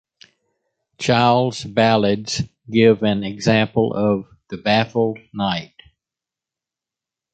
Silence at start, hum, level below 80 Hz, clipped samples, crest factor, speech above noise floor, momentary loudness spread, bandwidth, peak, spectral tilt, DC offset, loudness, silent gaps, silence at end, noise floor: 1 s; none; -52 dBFS; under 0.1%; 18 dB; 70 dB; 10 LU; 9 kHz; -2 dBFS; -5.5 dB/octave; under 0.1%; -19 LUFS; none; 1.7 s; -87 dBFS